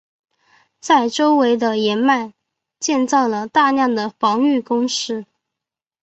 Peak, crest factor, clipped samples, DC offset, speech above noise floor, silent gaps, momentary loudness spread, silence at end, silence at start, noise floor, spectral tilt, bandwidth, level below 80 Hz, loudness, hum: -2 dBFS; 16 dB; under 0.1%; under 0.1%; 69 dB; none; 9 LU; 0.8 s; 0.85 s; -86 dBFS; -3.5 dB/octave; 8.2 kHz; -66 dBFS; -17 LUFS; none